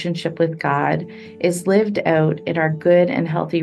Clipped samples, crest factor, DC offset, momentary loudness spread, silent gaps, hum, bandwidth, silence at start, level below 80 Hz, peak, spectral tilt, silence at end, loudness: under 0.1%; 16 dB; under 0.1%; 7 LU; none; none; 12.5 kHz; 0 s; -62 dBFS; -2 dBFS; -6.5 dB/octave; 0 s; -19 LUFS